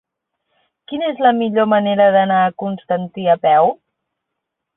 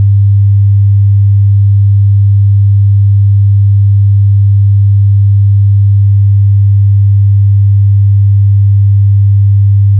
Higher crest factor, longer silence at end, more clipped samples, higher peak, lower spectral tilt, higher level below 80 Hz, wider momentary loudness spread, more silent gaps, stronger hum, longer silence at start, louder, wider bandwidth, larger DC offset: first, 16 dB vs 2 dB; first, 1.05 s vs 0 s; neither; about the same, -2 dBFS vs -2 dBFS; about the same, -11 dB/octave vs -12 dB/octave; second, -64 dBFS vs -20 dBFS; first, 10 LU vs 0 LU; neither; neither; first, 0.9 s vs 0 s; second, -15 LUFS vs -7 LUFS; first, 4 kHz vs 0.2 kHz; second, under 0.1% vs 0.4%